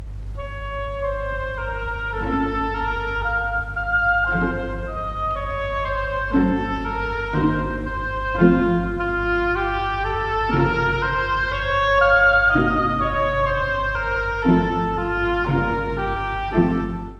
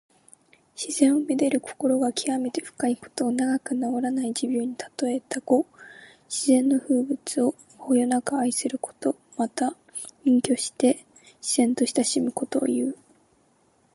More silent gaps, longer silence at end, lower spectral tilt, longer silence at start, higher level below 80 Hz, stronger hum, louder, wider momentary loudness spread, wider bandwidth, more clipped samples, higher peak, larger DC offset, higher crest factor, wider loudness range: neither; second, 0 s vs 1 s; first, -7.5 dB/octave vs -3.5 dB/octave; second, 0 s vs 0.8 s; first, -32 dBFS vs -74 dBFS; neither; first, -21 LUFS vs -25 LUFS; about the same, 10 LU vs 9 LU; second, 7.6 kHz vs 11.5 kHz; neither; first, -2 dBFS vs -6 dBFS; neither; about the same, 18 dB vs 20 dB; first, 5 LU vs 2 LU